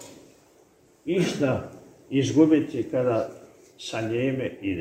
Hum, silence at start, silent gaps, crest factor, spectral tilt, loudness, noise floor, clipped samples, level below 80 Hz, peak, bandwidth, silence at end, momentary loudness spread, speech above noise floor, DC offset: none; 0 s; none; 20 dB; -6.5 dB/octave; -25 LUFS; -58 dBFS; under 0.1%; -62 dBFS; -6 dBFS; 11 kHz; 0 s; 17 LU; 34 dB; under 0.1%